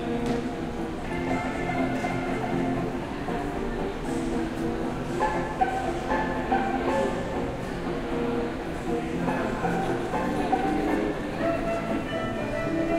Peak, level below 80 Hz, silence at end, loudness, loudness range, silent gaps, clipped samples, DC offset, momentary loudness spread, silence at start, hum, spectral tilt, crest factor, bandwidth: -10 dBFS; -40 dBFS; 0 s; -28 LUFS; 2 LU; none; under 0.1%; under 0.1%; 5 LU; 0 s; none; -6.5 dB/octave; 16 dB; 15.5 kHz